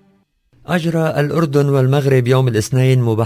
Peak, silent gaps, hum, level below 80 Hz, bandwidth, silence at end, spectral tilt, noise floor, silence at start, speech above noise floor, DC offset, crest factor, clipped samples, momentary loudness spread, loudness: 0 dBFS; none; none; -48 dBFS; 16 kHz; 0 s; -7 dB/octave; -57 dBFS; 0.7 s; 43 dB; under 0.1%; 14 dB; under 0.1%; 4 LU; -15 LUFS